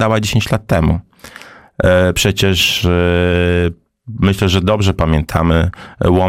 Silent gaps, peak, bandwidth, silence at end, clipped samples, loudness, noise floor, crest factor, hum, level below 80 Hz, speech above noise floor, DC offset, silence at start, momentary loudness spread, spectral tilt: none; -2 dBFS; 16.5 kHz; 0 s; under 0.1%; -14 LUFS; -38 dBFS; 12 dB; none; -28 dBFS; 25 dB; 0.5%; 0 s; 6 LU; -5.5 dB/octave